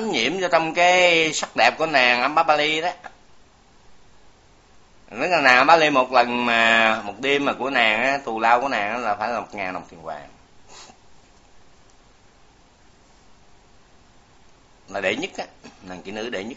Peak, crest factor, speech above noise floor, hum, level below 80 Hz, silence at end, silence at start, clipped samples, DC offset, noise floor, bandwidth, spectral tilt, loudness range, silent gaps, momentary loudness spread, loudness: 0 dBFS; 22 dB; 33 dB; none; -58 dBFS; 0 s; 0 s; under 0.1%; under 0.1%; -53 dBFS; 8 kHz; -0.5 dB/octave; 15 LU; none; 19 LU; -19 LUFS